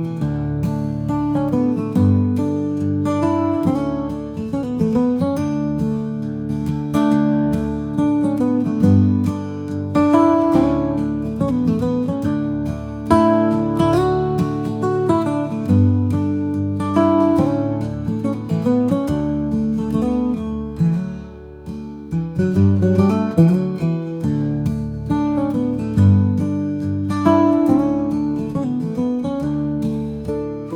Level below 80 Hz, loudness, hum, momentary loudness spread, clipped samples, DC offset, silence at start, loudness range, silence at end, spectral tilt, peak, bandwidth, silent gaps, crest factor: -42 dBFS; -19 LUFS; none; 9 LU; under 0.1%; under 0.1%; 0 s; 3 LU; 0 s; -9 dB/octave; 0 dBFS; 12 kHz; none; 18 dB